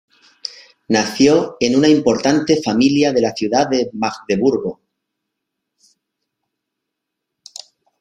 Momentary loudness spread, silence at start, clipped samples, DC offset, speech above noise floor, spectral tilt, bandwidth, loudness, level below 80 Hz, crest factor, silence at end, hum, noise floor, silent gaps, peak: 18 LU; 0.45 s; under 0.1%; under 0.1%; 64 dB; -5 dB/octave; 12 kHz; -16 LUFS; -56 dBFS; 18 dB; 3.25 s; none; -79 dBFS; none; 0 dBFS